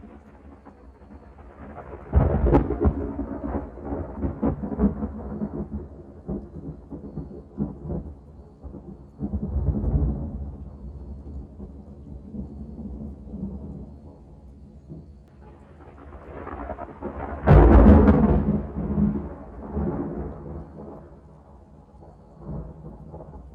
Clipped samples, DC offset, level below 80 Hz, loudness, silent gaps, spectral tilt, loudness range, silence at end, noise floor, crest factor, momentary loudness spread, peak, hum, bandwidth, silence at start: under 0.1%; under 0.1%; -30 dBFS; -24 LUFS; none; -11.5 dB/octave; 20 LU; 0 s; -49 dBFS; 24 dB; 22 LU; -2 dBFS; none; 3.8 kHz; 0.05 s